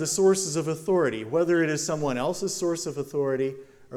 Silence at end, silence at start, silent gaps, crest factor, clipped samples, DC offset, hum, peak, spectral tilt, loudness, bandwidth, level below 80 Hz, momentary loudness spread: 0 s; 0 s; none; 16 dB; under 0.1%; under 0.1%; none; -10 dBFS; -4.5 dB/octave; -26 LUFS; 16 kHz; -62 dBFS; 8 LU